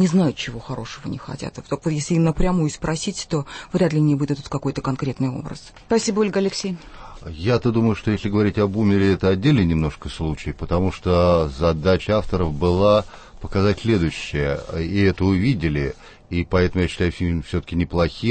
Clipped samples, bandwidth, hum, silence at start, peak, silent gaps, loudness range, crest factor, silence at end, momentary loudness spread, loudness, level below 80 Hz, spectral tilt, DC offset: under 0.1%; 8.8 kHz; none; 0 s; -6 dBFS; none; 4 LU; 16 dB; 0 s; 12 LU; -21 LUFS; -36 dBFS; -6.5 dB/octave; under 0.1%